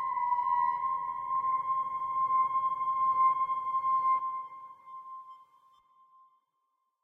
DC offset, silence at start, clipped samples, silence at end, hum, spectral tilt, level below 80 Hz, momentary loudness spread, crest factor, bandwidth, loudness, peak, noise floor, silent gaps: under 0.1%; 0 s; under 0.1%; 1.6 s; none; -5 dB/octave; -76 dBFS; 19 LU; 14 dB; 3.4 kHz; -30 LUFS; -18 dBFS; -79 dBFS; none